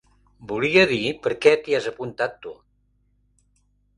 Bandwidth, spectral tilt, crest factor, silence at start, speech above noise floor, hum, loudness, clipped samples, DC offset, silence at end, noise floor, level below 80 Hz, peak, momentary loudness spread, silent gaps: 10.5 kHz; -5 dB/octave; 22 dB; 0.4 s; 44 dB; 50 Hz at -55 dBFS; -21 LUFS; under 0.1%; under 0.1%; 1.45 s; -65 dBFS; -58 dBFS; -2 dBFS; 14 LU; none